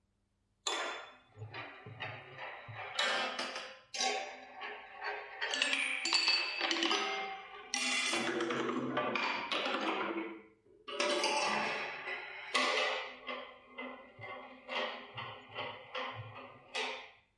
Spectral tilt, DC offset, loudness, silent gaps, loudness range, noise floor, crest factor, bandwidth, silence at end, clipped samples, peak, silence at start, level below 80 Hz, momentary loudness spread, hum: -1.5 dB/octave; under 0.1%; -35 LUFS; none; 9 LU; -78 dBFS; 24 dB; 11.5 kHz; 0.25 s; under 0.1%; -14 dBFS; 0.65 s; -82 dBFS; 16 LU; none